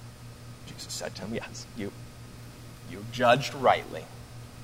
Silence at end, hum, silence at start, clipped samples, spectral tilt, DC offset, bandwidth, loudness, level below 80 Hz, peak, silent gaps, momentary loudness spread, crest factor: 0 s; none; 0 s; under 0.1%; -4.5 dB/octave; under 0.1%; 16 kHz; -29 LUFS; -54 dBFS; -8 dBFS; none; 22 LU; 24 dB